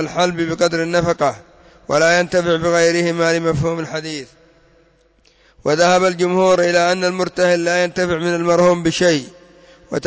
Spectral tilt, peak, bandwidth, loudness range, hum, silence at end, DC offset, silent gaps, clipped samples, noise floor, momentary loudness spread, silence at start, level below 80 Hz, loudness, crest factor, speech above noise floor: -4.5 dB/octave; -4 dBFS; 8 kHz; 4 LU; none; 0 s; under 0.1%; none; under 0.1%; -55 dBFS; 8 LU; 0 s; -48 dBFS; -16 LUFS; 12 dB; 39 dB